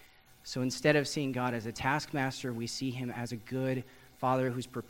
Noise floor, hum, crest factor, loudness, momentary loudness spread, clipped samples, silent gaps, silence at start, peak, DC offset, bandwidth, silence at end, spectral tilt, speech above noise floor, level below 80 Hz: -53 dBFS; none; 22 dB; -33 LUFS; 10 LU; under 0.1%; none; 0 s; -12 dBFS; under 0.1%; 16 kHz; 0 s; -5 dB/octave; 20 dB; -62 dBFS